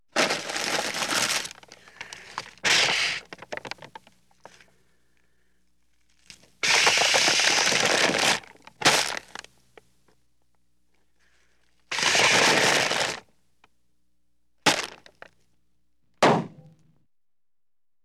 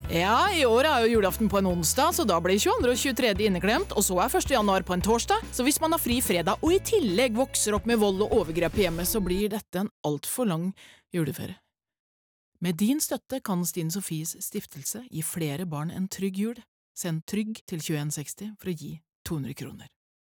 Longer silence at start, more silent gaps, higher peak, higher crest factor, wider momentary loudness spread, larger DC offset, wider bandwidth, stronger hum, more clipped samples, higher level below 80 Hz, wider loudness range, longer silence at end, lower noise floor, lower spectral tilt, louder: first, 0.15 s vs 0 s; second, none vs 9.69-9.73 s, 9.91-10.04 s, 11.99-12.52 s, 16.68-16.95 s, 17.22-17.27 s, 17.61-17.67 s, 19.09-19.25 s; first, -6 dBFS vs -14 dBFS; first, 22 dB vs 12 dB; first, 20 LU vs 12 LU; neither; second, 17.5 kHz vs over 20 kHz; neither; neither; second, -64 dBFS vs -46 dBFS; about the same, 9 LU vs 9 LU; first, 1.55 s vs 0.5 s; about the same, under -90 dBFS vs under -90 dBFS; second, -1 dB/octave vs -4 dB/octave; first, -21 LUFS vs -26 LUFS